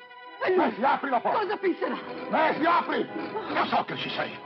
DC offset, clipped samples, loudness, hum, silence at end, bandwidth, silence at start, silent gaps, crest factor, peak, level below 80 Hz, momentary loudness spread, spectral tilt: under 0.1%; under 0.1%; -27 LUFS; none; 0 s; 6 kHz; 0 s; none; 16 dB; -12 dBFS; -74 dBFS; 8 LU; -7 dB/octave